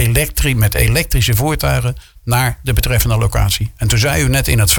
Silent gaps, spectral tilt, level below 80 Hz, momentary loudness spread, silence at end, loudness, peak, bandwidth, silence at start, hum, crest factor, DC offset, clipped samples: none; -4 dB/octave; -22 dBFS; 4 LU; 0 s; -15 LUFS; 0 dBFS; 19.5 kHz; 0 s; none; 14 dB; under 0.1%; under 0.1%